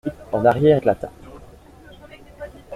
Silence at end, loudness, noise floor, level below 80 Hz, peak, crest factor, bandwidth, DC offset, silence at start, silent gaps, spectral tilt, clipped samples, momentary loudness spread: 0 s; -18 LUFS; -45 dBFS; -48 dBFS; -2 dBFS; 20 dB; 13 kHz; under 0.1%; 0.05 s; none; -8.5 dB/octave; under 0.1%; 23 LU